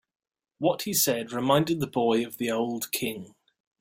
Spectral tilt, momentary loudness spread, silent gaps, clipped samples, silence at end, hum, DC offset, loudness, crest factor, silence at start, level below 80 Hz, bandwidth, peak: -4 dB/octave; 6 LU; none; under 0.1%; 0.5 s; none; under 0.1%; -26 LUFS; 20 dB; 0.6 s; -66 dBFS; 16.5 kHz; -8 dBFS